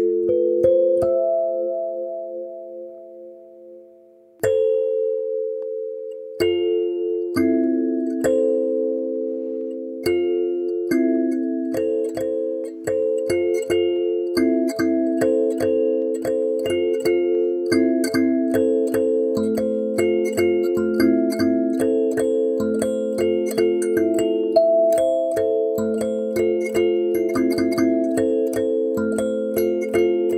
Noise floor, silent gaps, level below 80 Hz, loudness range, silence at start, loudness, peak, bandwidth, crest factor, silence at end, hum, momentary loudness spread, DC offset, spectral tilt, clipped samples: -50 dBFS; none; -58 dBFS; 5 LU; 0 s; -21 LUFS; -4 dBFS; 16 kHz; 16 dB; 0 s; none; 7 LU; under 0.1%; -5.5 dB/octave; under 0.1%